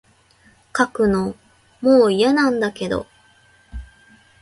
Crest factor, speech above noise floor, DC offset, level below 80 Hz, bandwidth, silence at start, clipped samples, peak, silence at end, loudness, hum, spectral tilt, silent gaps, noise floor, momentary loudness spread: 18 dB; 38 dB; under 0.1%; -44 dBFS; 11.5 kHz; 0.75 s; under 0.1%; -2 dBFS; 0.55 s; -18 LUFS; none; -5.5 dB/octave; none; -54 dBFS; 24 LU